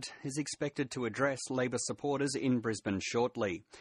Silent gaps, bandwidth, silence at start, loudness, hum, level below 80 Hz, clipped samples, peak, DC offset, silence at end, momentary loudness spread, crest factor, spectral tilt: none; 11.5 kHz; 0 s; -34 LUFS; none; -70 dBFS; under 0.1%; -16 dBFS; under 0.1%; 0 s; 5 LU; 18 dB; -4.5 dB/octave